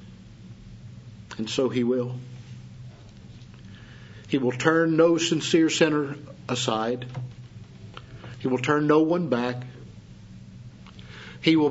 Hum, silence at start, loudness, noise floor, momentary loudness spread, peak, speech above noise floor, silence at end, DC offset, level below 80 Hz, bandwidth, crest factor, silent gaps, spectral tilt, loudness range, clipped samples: none; 0 s; -24 LUFS; -45 dBFS; 25 LU; -4 dBFS; 22 dB; 0 s; under 0.1%; -58 dBFS; 8 kHz; 22 dB; none; -5 dB/octave; 8 LU; under 0.1%